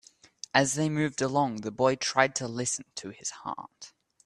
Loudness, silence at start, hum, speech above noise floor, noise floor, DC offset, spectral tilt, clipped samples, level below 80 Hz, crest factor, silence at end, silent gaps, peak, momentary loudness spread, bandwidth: -28 LUFS; 0.55 s; none; 20 dB; -49 dBFS; under 0.1%; -3.5 dB/octave; under 0.1%; -68 dBFS; 24 dB; 0.35 s; none; -6 dBFS; 17 LU; 13 kHz